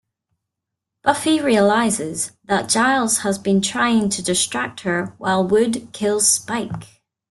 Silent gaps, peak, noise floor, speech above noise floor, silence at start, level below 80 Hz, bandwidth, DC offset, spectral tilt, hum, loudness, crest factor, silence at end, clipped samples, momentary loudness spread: none; -2 dBFS; -82 dBFS; 63 dB; 1.05 s; -58 dBFS; 12.5 kHz; under 0.1%; -3 dB/octave; none; -18 LUFS; 18 dB; 0.45 s; under 0.1%; 8 LU